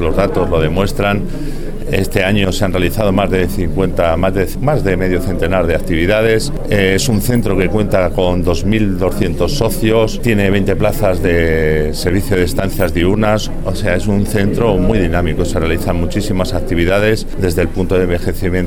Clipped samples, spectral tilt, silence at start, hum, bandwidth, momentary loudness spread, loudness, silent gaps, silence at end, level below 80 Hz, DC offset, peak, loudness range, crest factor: under 0.1%; -6 dB/octave; 0 s; none; 17.5 kHz; 4 LU; -15 LUFS; none; 0 s; -20 dBFS; under 0.1%; 0 dBFS; 1 LU; 14 dB